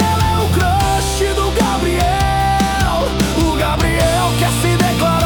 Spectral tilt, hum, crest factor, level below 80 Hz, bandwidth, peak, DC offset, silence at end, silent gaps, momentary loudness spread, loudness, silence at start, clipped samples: -5 dB/octave; none; 12 dB; -24 dBFS; 19 kHz; -2 dBFS; under 0.1%; 0 s; none; 2 LU; -15 LUFS; 0 s; under 0.1%